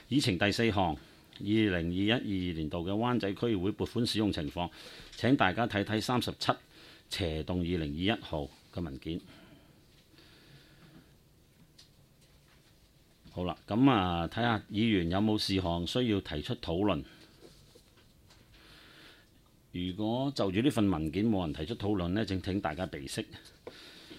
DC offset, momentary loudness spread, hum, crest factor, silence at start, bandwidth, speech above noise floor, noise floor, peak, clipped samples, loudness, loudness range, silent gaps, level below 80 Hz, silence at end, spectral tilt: under 0.1%; 13 LU; none; 24 dB; 0.1 s; 15.5 kHz; 31 dB; -63 dBFS; -10 dBFS; under 0.1%; -32 LUFS; 10 LU; none; -54 dBFS; 0 s; -6 dB/octave